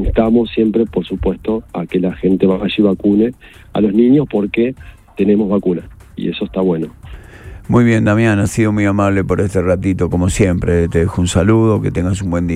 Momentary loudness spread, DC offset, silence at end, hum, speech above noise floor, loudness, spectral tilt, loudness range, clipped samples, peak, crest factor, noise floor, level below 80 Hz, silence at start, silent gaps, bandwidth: 9 LU; under 0.1%; 0 s; none; 20 dB; -15 LUFS; -7 dB/octave; 2 LU; under 0.1%; 0 dBFS; 14 dB; -34 dBFS; -32 dBFS; 0 s; none; 13.5 kHz